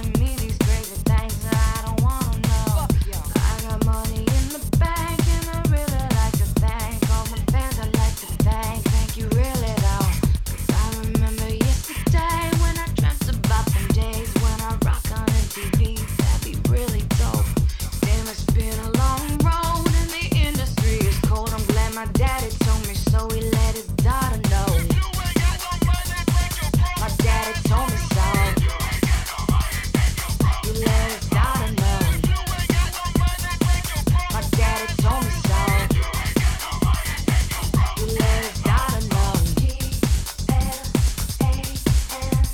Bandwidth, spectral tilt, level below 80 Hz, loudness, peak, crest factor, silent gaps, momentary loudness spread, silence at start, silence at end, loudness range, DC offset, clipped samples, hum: 17.5 kHz; -5 dB/octave; -24 dBFS; -22 LUFS; -4 dBFS; 16 dB; none; 3 LU; 0 s; 0 s; 1 LU; 0.2%; under 0.1%; none